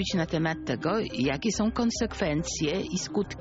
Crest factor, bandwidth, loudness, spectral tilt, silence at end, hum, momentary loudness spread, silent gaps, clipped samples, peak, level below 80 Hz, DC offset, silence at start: 14 dB; 8 kHz; -28 LUFS; -4.5 dB/octave; 0 s; none; 3 LU; none; under 0.1%; -14 dBFS; -46 dBFS; under 0.1%; 0 s